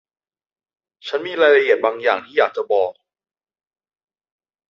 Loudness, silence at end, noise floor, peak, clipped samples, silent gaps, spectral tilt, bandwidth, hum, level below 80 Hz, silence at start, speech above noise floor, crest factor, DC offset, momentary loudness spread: -18 LUFS; 1.8 s; under -90 dBFS; -2 dBFS; under 0.1%; none; -4 dB/octave; 7 kHz; none; -70 dBFS; 1.05 s; over 73 dB; 20 dB; under 0.1%; 12 LU